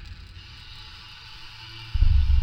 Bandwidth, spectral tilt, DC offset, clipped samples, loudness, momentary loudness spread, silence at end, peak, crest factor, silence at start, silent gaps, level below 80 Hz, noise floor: 6.2 kHz; -5.5 dB/octave; under 0.1%; under 0.1%; -26 LUFS; 20 LU; 0 s; -8 dBFS; 16 dB; 0 s; none; -26 dBFS; -43 dBFS